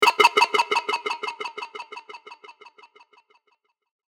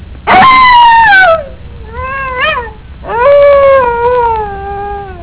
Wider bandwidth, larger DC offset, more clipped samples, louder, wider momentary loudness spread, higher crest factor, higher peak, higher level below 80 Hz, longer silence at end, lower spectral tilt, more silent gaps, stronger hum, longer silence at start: first, over 20 kHz vs 4 kHz; neither; neither; second, -21 LUFS vs -6 LUFS; first, 26 LU vs 17 LU; first, 24 dB vs 8 dB; about the same, 0 dBFS vs 0 dBFS; second, -84 dBFS vs -28 dBFS; first, 1.65 s vs 0 s; second, 0 dB/octave vs -7.5 dB/octave; neither; neither; about the same, 0 s vs 0 s